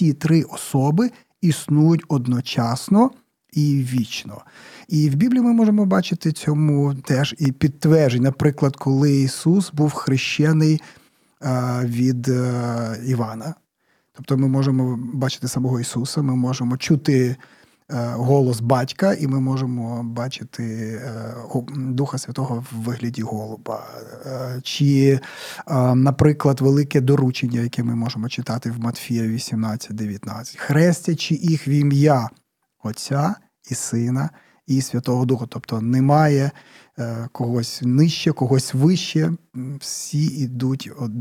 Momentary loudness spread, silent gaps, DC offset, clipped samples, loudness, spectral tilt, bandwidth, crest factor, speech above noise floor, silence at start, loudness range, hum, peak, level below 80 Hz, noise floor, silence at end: 12 LU; none; under 0.1%; under 0.1%; -20 LUFS; -6.5 dB/octave; 15.5 kHz; 20 dB; 47 dB; 0 s; 6 LU; none; 0 dBFS; -56 dBFS; -66 dBFS; 0 s